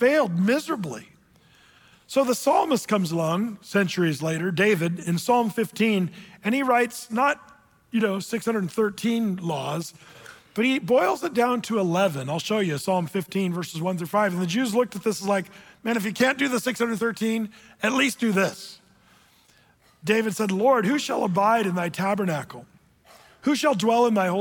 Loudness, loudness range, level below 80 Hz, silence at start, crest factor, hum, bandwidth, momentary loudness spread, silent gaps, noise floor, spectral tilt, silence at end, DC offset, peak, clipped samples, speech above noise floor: -24 LUFS; 3 LU; -68 dBFS; 0 s; 14 dB; none; 19 kHz; 9 LU; none; -59 dBFS; -5 dB/octave; 0 s; under 0.1%; -10 dBFS; under 0.1%; 36 dB